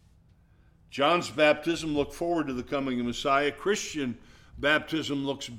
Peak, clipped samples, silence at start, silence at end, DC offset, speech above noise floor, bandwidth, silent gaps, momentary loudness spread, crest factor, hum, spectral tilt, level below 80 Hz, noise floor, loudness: -10 dBFS; under 0.1%; 0.9 s; 0 s; under 0.1%; 32 dB; 16 kHz; none; 9 LU; 20 dB; none; -4 dB/octave; -54 dBFS; -60 dBFS; -28 LUFS